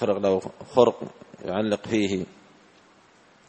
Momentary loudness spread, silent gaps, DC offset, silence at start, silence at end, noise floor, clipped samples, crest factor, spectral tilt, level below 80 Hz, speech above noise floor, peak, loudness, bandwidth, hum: 18 LU; none; under 0.1%; 0 s; 1.25 s; -56 dBFS; under 0.1%; 22 dB; -6 dB/octave; -62 dBFS; 32 dB; -4 dBFS; -25 LUFS; 8.4 kHz; none